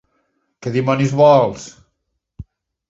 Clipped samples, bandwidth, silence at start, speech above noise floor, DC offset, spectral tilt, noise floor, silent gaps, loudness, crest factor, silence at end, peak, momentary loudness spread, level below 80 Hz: under 0.1%; 7.8 kHz; 0.6 s; 59 dB; under 0.1%; -7 dB/octave; -73 dBFS; none; -15 LUFS; 18 dB; 0.5 s; 0 dBFS; 21 LU; -50 dBFS